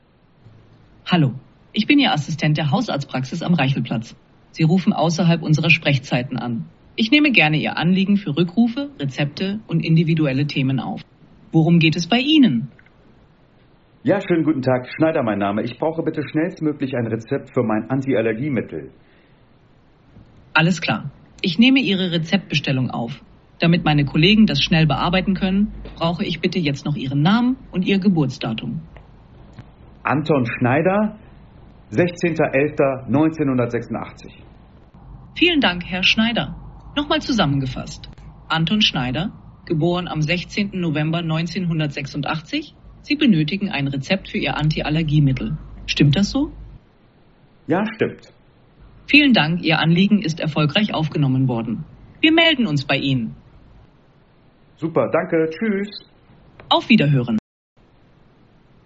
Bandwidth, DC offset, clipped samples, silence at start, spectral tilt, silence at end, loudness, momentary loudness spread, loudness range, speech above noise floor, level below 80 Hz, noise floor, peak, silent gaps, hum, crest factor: 7.8 kHz; under 0.1%; under 0.1%; 1.05 s; -4.5 dB/octave; 1.45 s; -19 LUFS; 12 LU; 5 LU; 34 dB; -46 dBFS; -53 dBFS; 0 dBFS; none; none; 20 dB